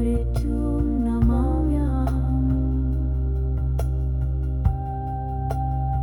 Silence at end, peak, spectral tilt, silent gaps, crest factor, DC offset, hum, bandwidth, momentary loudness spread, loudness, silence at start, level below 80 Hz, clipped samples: 0 s; -8 dBFS; -10 dB/octave; none; 14 dB; under 0.1%; none; 11.5 kHz; 5 LU; -24 LUFS; 0 s; -24 dBFS; under 0.1%